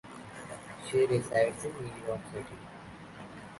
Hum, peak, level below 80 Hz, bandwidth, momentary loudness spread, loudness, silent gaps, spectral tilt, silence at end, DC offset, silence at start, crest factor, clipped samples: none; -14 dBFS; -62 dBFS; 11.5 kHz; 19 LU; -32 LUFS; none; -5.5 dB/octave; 0 s; under 0.1%; 0.05 s; 20 dB; under 0.1%